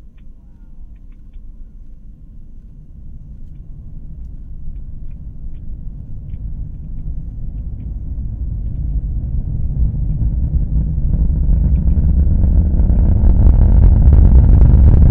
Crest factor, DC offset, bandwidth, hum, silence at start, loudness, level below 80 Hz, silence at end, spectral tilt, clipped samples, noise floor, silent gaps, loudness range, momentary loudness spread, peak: 14 dB; under 0.1%; 1.8 kHz; none; 0.05 s; -15 LUFS; -16 dBFS; 0 s; -13 dB/octave; 0.2%; -36 dBFS; none; 24 LU; 24 LU; 0 dBFS